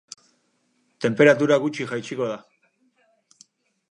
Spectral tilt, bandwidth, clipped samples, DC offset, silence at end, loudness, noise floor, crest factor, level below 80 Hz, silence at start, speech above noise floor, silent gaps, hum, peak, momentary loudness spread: -5.5 dB/octave; 10.5 kHz; under 0.1%; under 0.1%; 1.55 s; -21 LUFS; -68 dBFS; 20 dB; -74 dBFS; 1 s; 48 dB; none; none; -4 dBFS; 22 LU